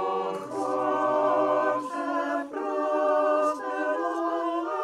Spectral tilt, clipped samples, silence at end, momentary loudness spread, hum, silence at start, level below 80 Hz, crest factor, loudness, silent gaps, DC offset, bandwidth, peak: -5 dB/octave; under 0.1%; 0 s; 7 LU; none; 0 s; -74 dBFS; 14 dB; -27 LUFS; none; under 0.1%; 11.5 kHz; -12 dBFS